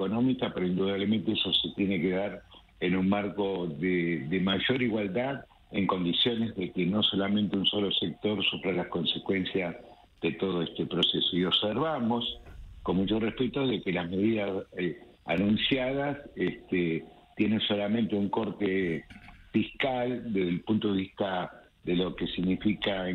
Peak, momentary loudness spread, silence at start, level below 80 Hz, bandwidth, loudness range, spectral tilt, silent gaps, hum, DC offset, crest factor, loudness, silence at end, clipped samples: -12 dBFS; 8 LU; 0 s; -56 dBFS; 5 kHz; 2 LU; -7.5 dB/octave; none; none; under 0.1%; 16 dB; -29 LUFS; 0 s; under 0.1%